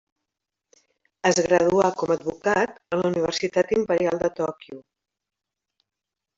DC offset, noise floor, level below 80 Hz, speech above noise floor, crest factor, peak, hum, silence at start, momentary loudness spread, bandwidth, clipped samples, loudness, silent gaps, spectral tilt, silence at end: under 0.1%; -84 dBFS; -60 dBFS; 62 dB; 20 dB; -6 dBFS; none; 1.25 s; 8 LU; 8 kHz; under 0.1%; -23 LUFS; none; -4.5 dB/octave; 1.55 s